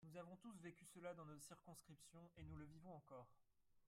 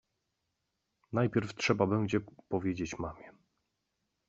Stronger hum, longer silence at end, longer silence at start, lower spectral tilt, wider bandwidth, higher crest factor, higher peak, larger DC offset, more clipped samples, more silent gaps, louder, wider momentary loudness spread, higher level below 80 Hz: neither; second, 0 s vs 1 s; second, 0 s vs 1.1 s; about the same, -5.5 dB/octave vs -5.5 dB/octave; first, 16 kHz vs 7.8 kHz; second, 18 dB vs 24 dB; second, -44 dBFS vs -12 dBFS; neither; neither; neither; second, -61 LUFS vs -33 LUFS; second, 7 LU vs 11 LU; second, -78 dBFS vs -64 dBFS